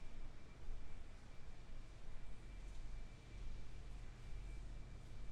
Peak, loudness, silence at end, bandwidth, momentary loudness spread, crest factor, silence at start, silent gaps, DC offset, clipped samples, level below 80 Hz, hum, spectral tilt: -34 dBFS; -58 LUFS; 0 s; 9.4 kHz; 5 LU; 12 dB; 0 s; none; under 0.1%; under 0.1%; -52 dBFS; none; -5.5 dB/octave